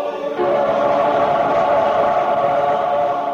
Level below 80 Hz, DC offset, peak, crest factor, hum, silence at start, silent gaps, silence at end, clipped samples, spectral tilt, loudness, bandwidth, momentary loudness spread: -54 dBFS; under 0.1%; -6 dBFS; 12 dB; none; 0 s; none; 0 s; under 0.1%; -6 dB/octave; -17 LUFS; 7.4 kHz; 3 LU